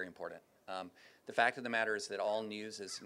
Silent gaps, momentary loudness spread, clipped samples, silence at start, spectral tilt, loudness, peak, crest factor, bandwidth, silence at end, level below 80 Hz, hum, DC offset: none; 17 LU; under 0.1%; 0 s; -2.5 dB/octave; -37 LUFS; -14 dBFS; 24 dB; 15.5 kHz; 0 s; -88 dBFS; none; under 0.1%